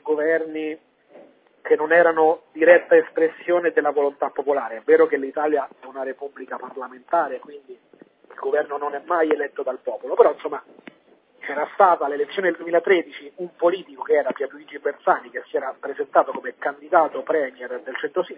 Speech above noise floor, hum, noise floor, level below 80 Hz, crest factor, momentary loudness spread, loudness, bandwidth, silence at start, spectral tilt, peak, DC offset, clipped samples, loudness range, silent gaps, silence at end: 35 dB; none; -56 dBFS; -76 dBFS; 22 dB; 16 LU; -21 LUFS; 4 kHz; 0.05 s; -8 dB/octave; 0 dBFS; under 0.1%; under 0.1%; 7 LU; none; 0 s